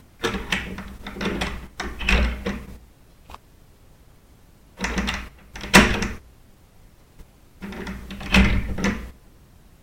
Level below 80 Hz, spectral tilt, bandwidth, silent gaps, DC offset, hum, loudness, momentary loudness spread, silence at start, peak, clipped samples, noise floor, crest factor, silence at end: -32 dBFS; -4 dB/octave; 16.5 kHz; none; under 0.1%; none; -23 LUFS; 22 LU; 0.2 s; 0 dBFS; under 0.1%; -51 dBFS; 26 dB; 0.7 s